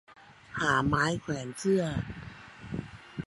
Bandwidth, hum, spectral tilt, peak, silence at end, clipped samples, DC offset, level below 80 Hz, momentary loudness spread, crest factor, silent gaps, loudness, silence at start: 11.5 kHz; none; -5.5 dB/octave; -12 dBFS; 0 s; under 0.1%; under 0.1%; -52 dBFS; 18 LU; 20 dB; none; -30 LUFS; 0.1 s